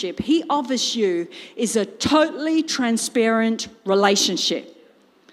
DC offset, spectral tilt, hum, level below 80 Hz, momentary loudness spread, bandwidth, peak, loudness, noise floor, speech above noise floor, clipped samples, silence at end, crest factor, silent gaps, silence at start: under 0.1%; -3 dB/octave; none; -58 dBFS; 7 LU; 15.5 kHz; -4 dBFS; -20 LUFS; -54 dBFS; 33 dB; under 0.1%; 0.6 s; 18 dB; none; 0 s